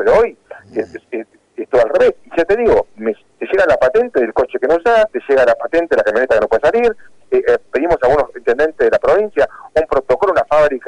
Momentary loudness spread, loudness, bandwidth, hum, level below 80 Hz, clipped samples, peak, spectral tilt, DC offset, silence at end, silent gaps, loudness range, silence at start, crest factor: 12 LU; -14 LUFS; 10 kHz; none; -40 dBFS; under 0.1%; -6 dBFS; -5.5 dB/octave; under 0.1%; 0.1 s; none; 2 LU; 0 s; 10 dB